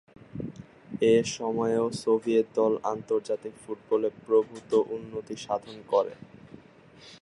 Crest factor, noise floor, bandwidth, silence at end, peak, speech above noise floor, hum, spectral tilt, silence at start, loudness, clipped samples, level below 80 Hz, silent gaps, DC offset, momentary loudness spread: 18 dB; -53 dBFS; 11.5 kHz; 0.05 s; -10 dBFS; 26 dB; none; -5.5 dB/octave; 0.35 s; -27 LUFS; under 0.1%; -66 dBFS; none; under 0.1%; 16 LU